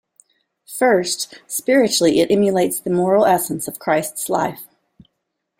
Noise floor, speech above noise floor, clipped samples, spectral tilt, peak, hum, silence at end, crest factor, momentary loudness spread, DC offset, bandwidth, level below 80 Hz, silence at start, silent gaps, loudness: -76 dBFS; 58 dB; under 0.1%; -4 dB/octave; -2 dBFS; none; 0.95 s; 16 dB; 9 LU; under 0.1%; 16.5 kHz; -60 dBFS; 0.7 s; none; -18 LUFS